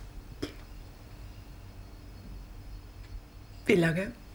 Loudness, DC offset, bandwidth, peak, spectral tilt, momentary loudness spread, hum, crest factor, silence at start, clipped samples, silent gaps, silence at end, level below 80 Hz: -30 LUFS; under 0.1%; over 20 kHz; -8 dBFS; -6.5 dB/octave; 24 LU; none; 28 dB; 0 s; under 0.1%; none; 0 s; -48 dBFS